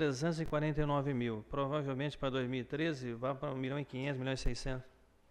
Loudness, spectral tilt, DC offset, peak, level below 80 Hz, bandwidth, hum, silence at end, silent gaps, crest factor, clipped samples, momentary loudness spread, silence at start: -37 LUFS; -6.5 dB/octave; under 0.1%; -20 dBFS; -48 dBFS; 10.5 kHz; none; 0.4 s; none; 16 dB; under 0.1%; 5 LU; 0 s